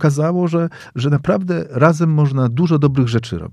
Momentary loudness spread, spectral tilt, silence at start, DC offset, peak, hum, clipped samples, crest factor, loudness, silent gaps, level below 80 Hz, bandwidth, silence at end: 7 LU; -8 dB/octave; 0 s; under 0.1%; 0 dBFS; none; under 0.1%; 16 dB; -16 LUFS; none; -48 dBFS; 10.5 kHz; 0.05 s